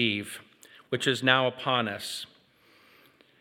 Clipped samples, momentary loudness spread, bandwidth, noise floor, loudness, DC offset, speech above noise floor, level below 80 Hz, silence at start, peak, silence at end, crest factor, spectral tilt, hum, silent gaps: under 0.1%; 18 LU; 17.5 kHz; -61 dBFS; -27 LUFS; under 0.1%; 33 dB; -80 dBFS; 0 s; -4 dBFS; 1.15 s; 26 dB; -4 dB/octave; none; none